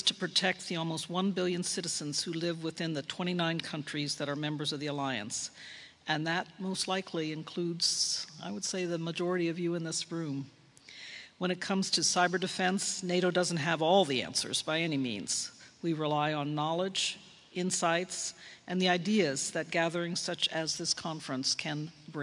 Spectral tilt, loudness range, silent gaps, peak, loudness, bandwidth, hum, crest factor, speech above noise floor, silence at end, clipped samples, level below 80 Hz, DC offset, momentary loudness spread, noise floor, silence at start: -3.5 dB/octave; 5 LU; none; -12 dBFS; -32 LUFS; 11.5 kHz; none; 20 dB; 20 dB; 0 s; under 0.1%; -78 dBFS; under 0.1%; 9 LU; -52 dBFS; 0 s